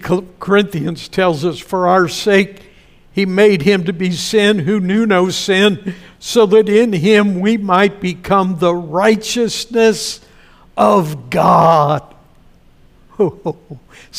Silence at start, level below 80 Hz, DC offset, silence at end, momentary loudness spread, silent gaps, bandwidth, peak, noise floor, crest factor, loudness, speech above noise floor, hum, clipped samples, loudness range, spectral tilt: 0 s; -48 dBFS; under 0.1%; 0 s; 11 LU; none; 16 kHz; 0 dBFS; -46 dBFS; 14 dB; -14 LUFS; 33 dB; none; under 0.1%; 3 LU; -5 dB/octave